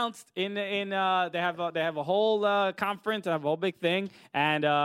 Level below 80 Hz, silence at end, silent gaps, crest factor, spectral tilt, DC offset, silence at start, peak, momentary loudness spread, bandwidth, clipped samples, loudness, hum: -78 dBFS; 0 s; none; 18 dB; -5.5 dB/octave; under 0.1%; 0 s; -12 dBFS; 6 LU; 16 kHz; under 0.1%; -28 LUFS; none